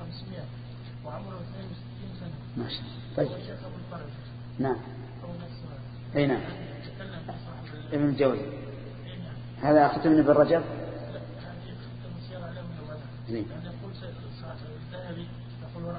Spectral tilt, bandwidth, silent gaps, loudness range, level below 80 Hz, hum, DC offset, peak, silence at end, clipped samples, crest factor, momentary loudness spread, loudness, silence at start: -11 dB/octave; 5 kHz; none; 14 LU; -54 dBFS; none; under 0.1%; -8 dBFS; 0 s; under 0.1%; 22 dB; 19 LU; -30 LUFS; 0 s